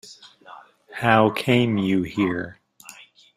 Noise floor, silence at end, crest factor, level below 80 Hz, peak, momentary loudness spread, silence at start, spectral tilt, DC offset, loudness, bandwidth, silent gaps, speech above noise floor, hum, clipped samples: -47 dBFS; 0.45 s; 22 dB; -58 dBFS; -2 dBFS; 21 LU; 0.05 s; -6.5 dB/octave; under 0.1%; -21 LUFS; 15.5 kHz; none; 27 dB; none; under 0.1%